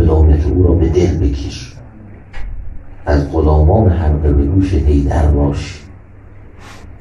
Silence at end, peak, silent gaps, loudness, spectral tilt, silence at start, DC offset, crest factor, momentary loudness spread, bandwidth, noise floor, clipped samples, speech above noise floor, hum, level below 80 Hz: 0.05 s; 0 dBFS; none; -13 LUFS; -8.5 dB/octave; 0 s; under 0.1%; 12 dB; 21 LU; 7.4 kHz; -36 dBFS; under 0.1%; 24 dB; none; -18 dBFS